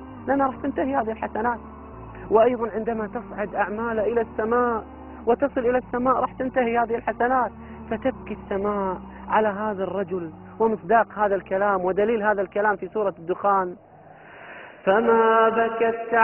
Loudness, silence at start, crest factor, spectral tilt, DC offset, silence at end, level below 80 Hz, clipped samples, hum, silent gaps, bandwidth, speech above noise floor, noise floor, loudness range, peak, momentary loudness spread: -23 LUFS; 0 s; 20 dB; -9.5 dB/octave; under 0.1%; 0 s; -50 dBFS; under 0.1%; none; none; 3.3 kHz; 24 dB; -47 dBFS; 3 LU; -4 dBFS; 12 LU